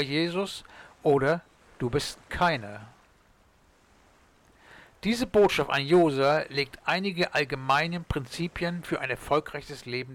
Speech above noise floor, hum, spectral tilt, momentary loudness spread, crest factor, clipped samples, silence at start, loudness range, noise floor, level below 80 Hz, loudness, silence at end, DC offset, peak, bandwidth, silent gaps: 35 dB; none; -5.5 dB/octave; 12 LU; 14 dB; under 0.1%; 0 s; 8 LU; -61 dBFS; -52 dBFS; -27 LUFS; 0 s; under 0.1%; -14 dBFS; 17 kHz; none